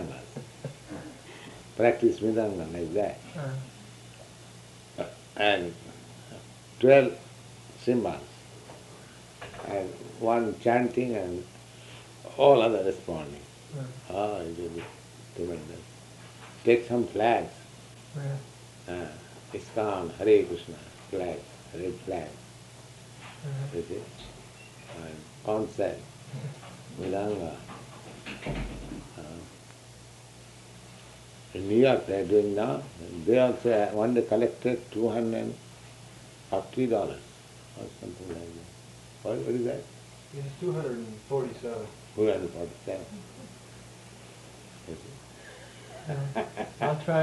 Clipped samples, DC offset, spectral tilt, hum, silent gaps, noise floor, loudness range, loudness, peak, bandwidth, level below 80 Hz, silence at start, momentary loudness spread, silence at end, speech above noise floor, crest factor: under 0.1%; under 0.1%; -6 dB/octave; none; none; -50 dBFS; 12 LU; -29 LUFS; -6 dBFS; 12 kHz; -58 dBFS; 0 s; 24 LU; 0 s; 22 dB; 26 dB